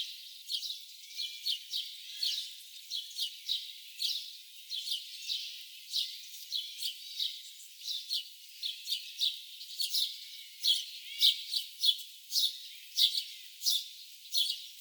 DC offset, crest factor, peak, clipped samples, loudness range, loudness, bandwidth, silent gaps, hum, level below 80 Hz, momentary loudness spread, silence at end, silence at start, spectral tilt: under 0.1%; 24 dB; -12 dBFS; under 0.1%; 7 LU; -33 LUFS; over 20 kHz; none; none; under -90 dBFS; 16 LU; 0 s; 0 s; 11.5 dB/octave